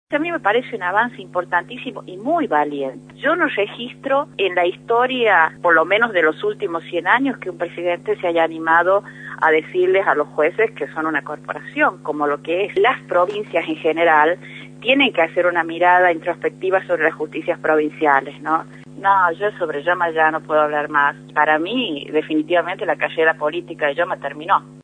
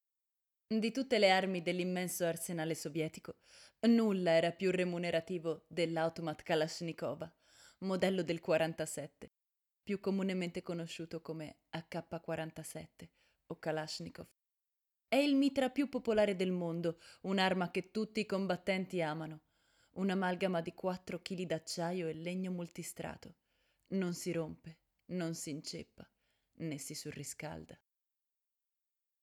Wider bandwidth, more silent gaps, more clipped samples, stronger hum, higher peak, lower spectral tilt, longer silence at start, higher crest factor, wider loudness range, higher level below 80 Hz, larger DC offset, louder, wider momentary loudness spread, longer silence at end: second, 9.8 kHz vs 16 kHz; neither; neither; neither; first, 0 dBFS vs -16 dBFS; about the same, -5.5 dB/octave vs -5 dB/octave; second, 0.1 s vs 0.7 s; about the same, 18 dB vs 22 dB; second, 3 LU vs 10 LU; first, -64 dBFS vs -74 dBFS; neither; first, -18 LUFS vs -37 LUFS; second, 9 LU vs 16 LU; second, 0.05 s vs 1.5 s